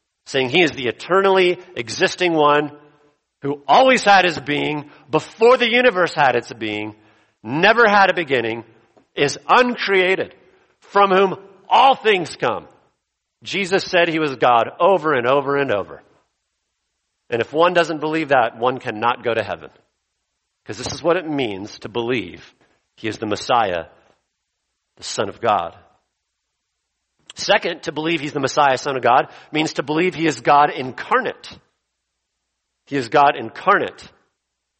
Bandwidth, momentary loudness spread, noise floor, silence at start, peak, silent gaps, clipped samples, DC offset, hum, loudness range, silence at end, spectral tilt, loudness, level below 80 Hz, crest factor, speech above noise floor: 8.8 kHz; 14 LU; -76 dBFS; 0.3 s; 0 dBFS; none; under 0.1%; under 0.1%; none; 8 LU; 0.75 s; -4 dB/octave; -18 LUFS; -60 dBFS; 18 dB; 58 dB